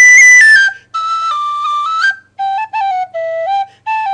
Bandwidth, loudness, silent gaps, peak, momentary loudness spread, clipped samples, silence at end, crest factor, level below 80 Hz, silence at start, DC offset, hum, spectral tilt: 11 kHz; -9 LUFS; none; 0 dBFS; 17 LU; under 0.1%; 0 s; 10 dB; -62 dBFS; 0 s; under 0.1%; none; 3 dB/octave